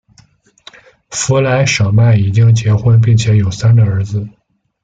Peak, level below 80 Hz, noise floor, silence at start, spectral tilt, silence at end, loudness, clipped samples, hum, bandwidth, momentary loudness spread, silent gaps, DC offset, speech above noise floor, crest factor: -2 dBFS; -42 dBFS; -49 dBFS; 1.1 s; -6 dB/octave; 0.55 s; -11 LUFS; under 0.1%; none; 9 kHz; 10 LU; none; under 0.1%; 39 dB; 10 dB